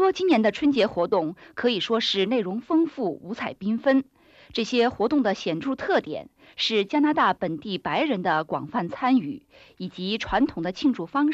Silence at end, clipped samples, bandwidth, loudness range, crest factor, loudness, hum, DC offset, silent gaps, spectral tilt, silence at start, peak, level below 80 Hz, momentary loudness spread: 0 s; under 0.1%; 8 kHz; 2 LU; 14 dB; -24 LUFS; none; under 0.1%; none; -5.5 dB/octave; 0 s; -10 dBFS; -56 dBFS; 11 LU